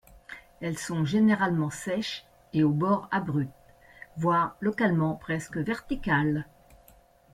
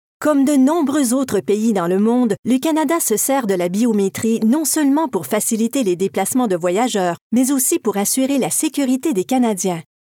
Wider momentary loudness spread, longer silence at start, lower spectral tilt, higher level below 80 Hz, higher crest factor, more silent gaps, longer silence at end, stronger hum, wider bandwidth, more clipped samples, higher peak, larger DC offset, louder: first, 13 LU vs 3 LU; about the same, 0.3 s vs 0.2 s; first, -6.5 dB/octave vs -4.5 dB/octave; first, -54 dBFS vs -68 dBFS; about the same, 16 dB vs 12 dB; second, none vs 2.39-2.43 s, 7.21-7.30 s; first, 0.9 s vs 0.2 s; neither; second, 14.5 kHz vs 19 kHz; neither; second, -12 dBFS vs -4 dBFS; neither; second, -28 LUFS vs -17 LUFS